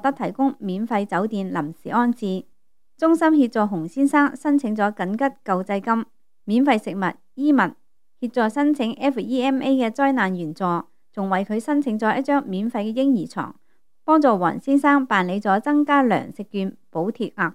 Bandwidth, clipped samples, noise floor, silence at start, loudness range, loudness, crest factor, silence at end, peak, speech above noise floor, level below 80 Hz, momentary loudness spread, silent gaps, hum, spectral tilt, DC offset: 12 kHz; under 0.1%; -63 dBFS; 0.05 s; 3 LU; -21 LUFS; 18 dB; 0 s; -4 dBFS; 42 dB; -72 dBFS; 10 LU; none; none; -7 dB/octave; 0.3%